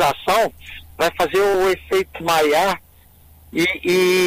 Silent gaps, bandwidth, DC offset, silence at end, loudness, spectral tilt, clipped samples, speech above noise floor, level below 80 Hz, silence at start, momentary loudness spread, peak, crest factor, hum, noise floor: none; 16 kHz; under 0.1%; 0 s; -19 LUFS; -3.5 dB/octave; under 0.1%; 31 dB; -46 dBFS; 0 s; 10 LU; -8 dBFS; 12 dB; none; -49 dBFS